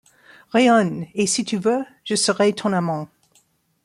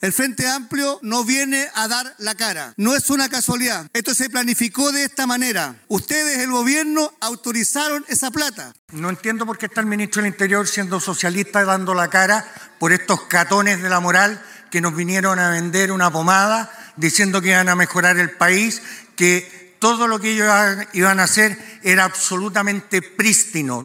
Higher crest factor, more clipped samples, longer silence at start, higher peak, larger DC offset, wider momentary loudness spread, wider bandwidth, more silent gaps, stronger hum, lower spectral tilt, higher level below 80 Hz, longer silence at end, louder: about the same, 16 dB vs 18 dB; neither; first, 0.55 s vs 0 s; second, -6 dBFS vs 0 dBFS; neither; about the same, 10 LU vs 8 LU; second, 14.5 kHz vs 17.5 kHz; second, none vs 8.79-8.88 s; neither; about the same, -4 dB/octave vs -3 dB/octave; about the same, -66 dBFS vs -64 dBFS; first, 0.8 s vs 0 s; second, -20 LUFS vs -17 LUFS